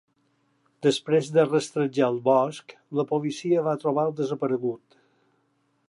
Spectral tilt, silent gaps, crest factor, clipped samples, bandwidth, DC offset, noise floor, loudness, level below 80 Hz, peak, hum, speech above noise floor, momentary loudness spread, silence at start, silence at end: -6 dB/octave; none; 18 dB; under 0.1%; 11.5 kHz; under 0.1%; -70 dBFS; -25 LUFS; -78 dBFS; -8 dBFS; none; 46 dB; 8 LU; 0.8 s; 1.1 s